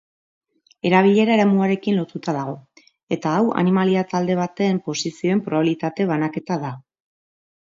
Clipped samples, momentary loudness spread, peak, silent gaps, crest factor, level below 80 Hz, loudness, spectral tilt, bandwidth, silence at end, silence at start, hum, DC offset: under 0.1%; 11 LU; -2 dBFS; 3.03-3.07 s; 18 dB; -66 dBFS; -20 LUFS; -6.5 dB/octave; 7.6 kHz; 0.85 s; 0.85 s; none; under 0.1%